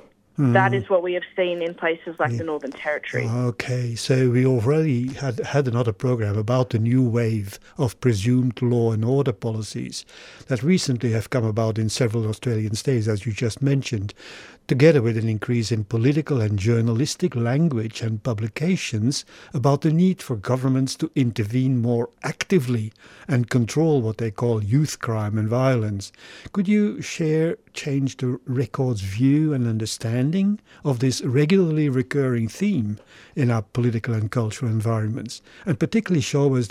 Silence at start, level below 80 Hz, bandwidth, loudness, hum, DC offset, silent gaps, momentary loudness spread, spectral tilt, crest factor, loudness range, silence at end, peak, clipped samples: 0.4 s; -58 dBFS; 14 kHz; -22 LUFS; none; under 0.1%; none; 9 LU; -6.5 dB/octave; 18 dB; 2 LU; 0 s; -2 dBFS; under 0.1%